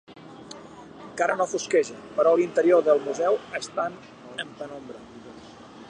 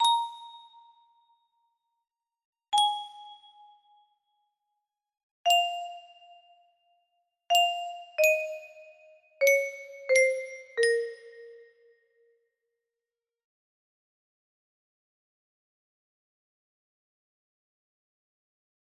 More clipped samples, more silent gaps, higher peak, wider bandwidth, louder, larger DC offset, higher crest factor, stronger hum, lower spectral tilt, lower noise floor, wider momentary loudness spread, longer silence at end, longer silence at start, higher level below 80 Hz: neither; second, none vs 2.45-2.53 s, 5.23-5.44 s; about the same, -8 dBFS vs -10 dBFS; second, 10.5 kHz vs 15.5 kHz; first, -24 LUFS vs -27 LUFS; neither; about the same, 18 dB vs 22 dB; neither; first, -4 dB/octave vs 2.5 dB/octave; second, -45 dBFS vs under -90 dBFS; about the same, 24 LU vs 23 LU; second, 0 s vs 7.45 s; about the same, 0.1 s vs 0 s; first, -68 dBFS vs -86 dBFS